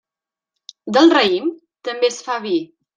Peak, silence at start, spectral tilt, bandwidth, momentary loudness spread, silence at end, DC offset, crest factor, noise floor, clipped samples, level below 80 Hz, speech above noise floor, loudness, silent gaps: -2 dBFS; 0.85 s; -3.5 dB/octave; 9.2 kHz; 16 LU; 0.3 s; under 0.1%; 16 dB; -88 dBFS; under 0.1%; -68 dBFS; 72 dB; -17 LUFS; none